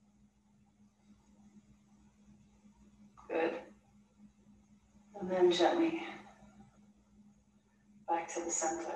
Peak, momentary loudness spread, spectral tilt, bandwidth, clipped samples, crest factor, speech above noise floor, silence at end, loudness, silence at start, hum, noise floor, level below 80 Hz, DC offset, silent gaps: -16 dBFS; 23 LU; -3.5 dB/octave; 10 kHz; under 0.1%; 24 dB; 37 dB; 0 s; -34 LUFS; 1.55 s; none; -69 dBFS; -74 dBFS; under 0.1%; none